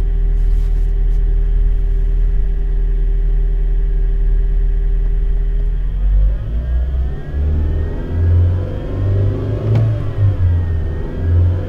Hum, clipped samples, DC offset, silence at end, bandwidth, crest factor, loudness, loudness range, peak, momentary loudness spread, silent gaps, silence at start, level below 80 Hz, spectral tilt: none; under 0.1%; under 0.1%; 0 s; 3.4 kHz; 10 dB; -19 LUFS; 3 LU; -4 dBFS; 6 LU; none; 0 s; -16 dBFS; -10 dB/octave